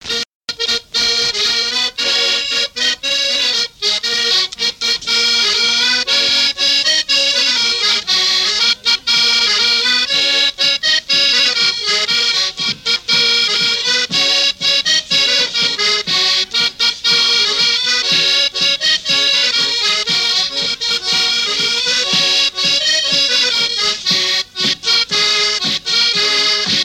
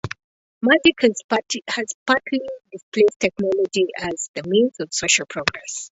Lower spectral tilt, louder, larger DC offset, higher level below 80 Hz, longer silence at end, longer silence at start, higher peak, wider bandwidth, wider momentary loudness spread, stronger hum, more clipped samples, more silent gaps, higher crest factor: second, 0.5 dB/octave vs -3 dB/octave; first, -12 LUFS vs -20 LUFS; neither; about the same, -54 dBFS vs -56 dBFS; about the same, 0 s vs 0.05 s; about the same, 0.05 s vs 0.05 s; second, -4 dBFS vs 0 dBFS; first, 17 kHz vs 8 kHz; second, 4 LU vs 12 LU; neither; neither; second, 0.33-0.41 s vs 0.24-0.61 s, 1.24-1.29 s, 1.94-2.06 s, 2.83-2.92 s, 3.16-3.20 s, 4.29-4.34 s; second, 12 dB vs 20 dB